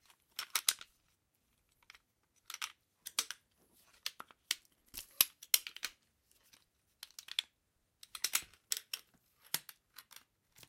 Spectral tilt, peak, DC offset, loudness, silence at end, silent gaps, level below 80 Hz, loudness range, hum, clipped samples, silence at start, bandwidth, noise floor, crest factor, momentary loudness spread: 2.5 dB/octave; -6 dBFS; under 0.1%; -38 LUFS; 0.65 s; none; -80 dBFS; 8 LU; none; under 0.1%; 0.4 s; 17 kHz; -80 dBFS; 38 dB; 23 LU